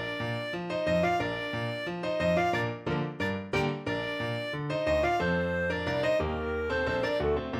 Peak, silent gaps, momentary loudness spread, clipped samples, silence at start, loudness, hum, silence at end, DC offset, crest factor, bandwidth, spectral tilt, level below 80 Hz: -14 dBFS; none; 6 LU; under 0.1%; 0 s; -30 LUFS; none; 0 s; under 0.1%; 14 dB; 14.5 kHz; -6.5 dB/octave; -48 dBFS